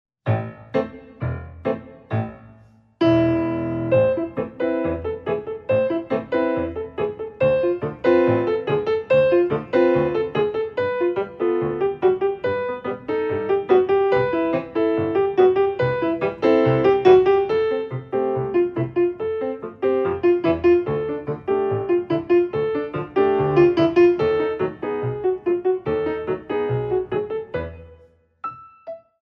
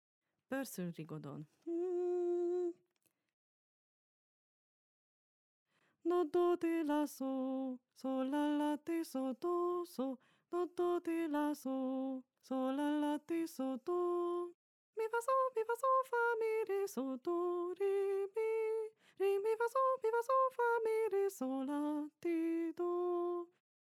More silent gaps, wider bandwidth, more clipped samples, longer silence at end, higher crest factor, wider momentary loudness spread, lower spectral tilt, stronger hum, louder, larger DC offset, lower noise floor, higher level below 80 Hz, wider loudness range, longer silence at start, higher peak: second, none vs 3.33-5.66 s, 14.54-14.93 s; second, 5.8 kHz vs 16.5 kHz; neither; second, 0.25 s vs 0.4 s; about the same, 18 dB vs 14 dB; about the same, 11 LU vs 10 LU; first, -9 dB/octave vs -5.5 dB/octave; neither; first, -21 LUFS vs -38 LUFS; neither; second, -53 dBFS vs -82 dBFS; first, -50 dBFS vs under -90 dBFS; about the same, 5 LU vs 6 LU; second, 0.25 s vs 0.5 s; first, -2 dBFS vs -24 dBFS